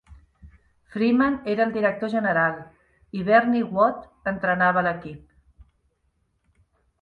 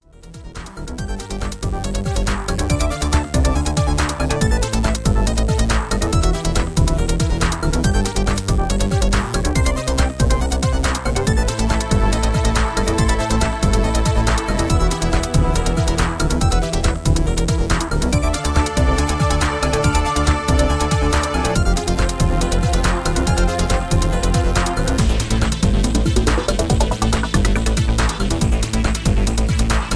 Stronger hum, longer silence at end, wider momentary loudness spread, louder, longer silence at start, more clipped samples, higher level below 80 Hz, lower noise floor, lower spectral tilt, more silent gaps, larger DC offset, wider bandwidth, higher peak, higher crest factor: neither; first, 1.85 s vs 0 s; first, 15 LU vs 2 LU; second, -22 LUFS vs -19 LUFS; second, 0.1 s vs 0.25 s; neither; second, -56 dBFS vs -20 dBFS; first, -70 dBFS vs -37 dBFS; first, -8.5 dB/octave vs -5 dB/octave; neither; neither; second, 5 kHz vs 11 kHz; about the same, -4 dBFS vs -2 dBFS; first, 22 dB vs 14 dB